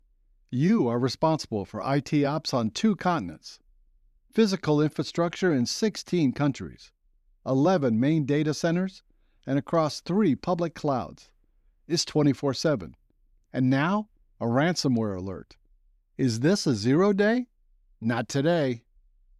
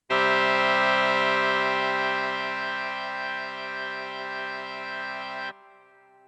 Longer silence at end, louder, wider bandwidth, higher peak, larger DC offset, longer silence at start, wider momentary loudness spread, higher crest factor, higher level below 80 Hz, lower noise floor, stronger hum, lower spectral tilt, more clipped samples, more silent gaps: second, 0.6 s vs 0.75 s; about the same, -26 LUFS vs -25 LUFS; first, 13 kHz vs 10.5 kHz; about the same, -10 dBFS vs -12 dBFS; neither; first, 0.5 s vs 0.1 s; about the same, 12 LU vs 12 LU; about the same, 16 dB vs 16 dB; first, -60 dBFS vs -84 dBFS; first, -64 dBFS vs -56 dBFS; neither; first, -6 dB/octave vs -3.5 dB/octave; neither; neither